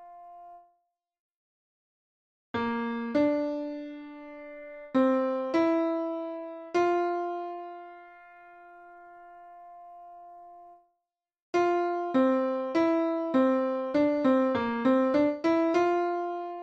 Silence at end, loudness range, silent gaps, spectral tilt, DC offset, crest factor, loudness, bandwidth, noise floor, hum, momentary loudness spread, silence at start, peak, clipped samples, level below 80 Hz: 0 s; 11 LU; 1.20-2.54 s, 11.42-11.53 s; -6 dB/octave; under 0.1%; 16 dB; -27 LUFS; 7.6 kHz; -85 dBFS; none; 23 LU; 0 s; -14 dBFS; under 0.1%; -70 dBFS